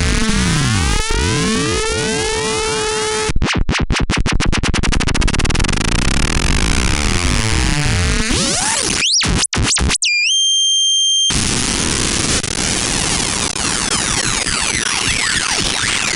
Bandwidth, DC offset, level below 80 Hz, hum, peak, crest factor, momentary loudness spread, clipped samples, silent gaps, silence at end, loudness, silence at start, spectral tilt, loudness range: 16 kHz; under 0.1%; -22 dBFS; none; -2 dBFS; 14 dB; 6 LU; under 0.1%; none; 0 s; -15 LUFS; 0 s; -2.5 dB/octave; 4 LU